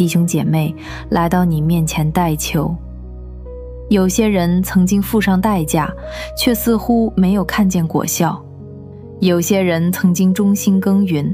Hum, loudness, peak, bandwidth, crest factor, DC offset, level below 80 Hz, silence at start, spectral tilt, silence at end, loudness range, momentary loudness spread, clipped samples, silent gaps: none; -16 LUFS; 0 dBFS; 15.5 kHz; 14 dB; under 0.1%; -34 dBFS; 0 s; -6 dB/octave; 0 s; 2 LU; 18 LU; under 0.1%; none